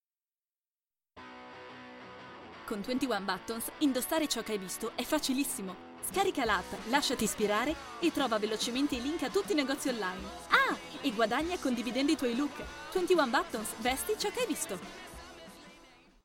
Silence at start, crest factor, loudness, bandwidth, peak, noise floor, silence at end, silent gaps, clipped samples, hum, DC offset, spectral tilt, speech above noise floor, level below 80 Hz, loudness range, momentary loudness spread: 1.15 s; 24 dB; -32 LUFS; 17 kHz; -10 dBFS; under -90 dBFS; 0.4 s; none; under 0.1%; none; under 0.1%; -3 dB/octave; over 58 dB; -58 dBFS; 4 LU; 19 LU